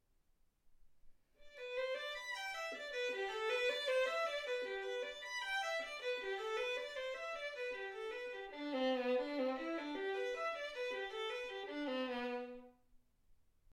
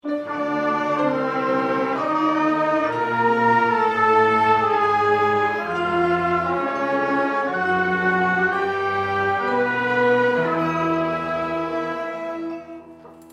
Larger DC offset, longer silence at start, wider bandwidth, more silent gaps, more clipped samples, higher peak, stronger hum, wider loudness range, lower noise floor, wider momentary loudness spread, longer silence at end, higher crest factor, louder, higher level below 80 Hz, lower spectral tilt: neither; first, 0.65 s vs 0.05 s; about the same, 14 kHz vs 13 kHz; neither; neither; second, -26 dBFS vs -6 dBFS; neither; about the same, 4 LU vs 3 LU; first, -75 dBFS vs -43 dBFS; about the same, 8 LU vs 8 LU; about the same, 0 s vs 0 s; about the same, 16 dB vs 14 dB; second, -41 LUFS vs -20 LUFS; second, -74 dBFS vs -58 dBFS; second, -1.5 dB/octave vs -6.5 dB/octave